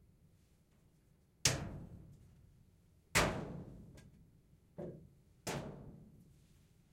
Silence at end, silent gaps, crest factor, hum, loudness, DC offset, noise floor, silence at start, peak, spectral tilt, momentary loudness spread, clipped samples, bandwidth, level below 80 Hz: 0.7 s; none; 30 dB; none; -39 LUFS; under 0.1%; -70 dBFS; 1.45 s; -14 dBFS; -3 dB/octave; 25 LU; under 0.1%; 16 kHz; -60 dBFS